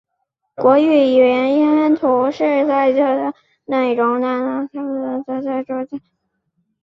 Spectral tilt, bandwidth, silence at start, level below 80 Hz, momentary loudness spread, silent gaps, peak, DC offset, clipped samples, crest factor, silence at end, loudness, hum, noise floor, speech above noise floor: -6.5 dB/octave; 6.2 kHz; 0.6 s; -64 dBFS; 11 LU; none; -2 dBFS; under 0.1%; under 0.1%; 16 dB; 0.85 s; -16 LUFS; none; -73 dBFS; 57 dB